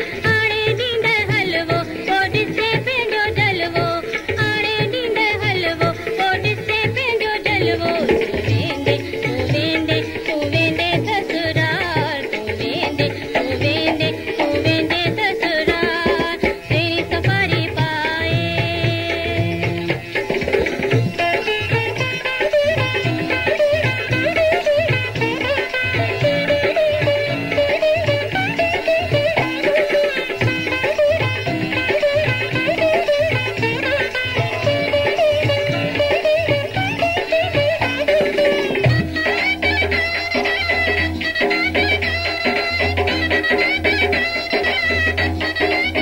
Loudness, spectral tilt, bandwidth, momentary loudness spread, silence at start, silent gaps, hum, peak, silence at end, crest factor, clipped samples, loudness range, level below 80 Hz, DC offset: -18 LUFS; -5.5 dB/octave; 16.5 kHz; 4 LU; 0 s; none; none; -2 dBFS; 0 s; 16 dB; under 0.1%; 2 LU; -40 dBFS; under 0.1%